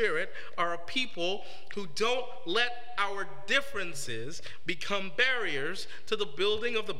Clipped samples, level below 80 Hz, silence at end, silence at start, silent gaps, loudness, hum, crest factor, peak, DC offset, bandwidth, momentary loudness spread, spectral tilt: under 0.1%; -66 dBFS; 0 s; 0 s; none; -32 LUFS; none; 20 dB; -12 dBFS; 3%; 16 kHz; 11 LU; -2.5 dB/octave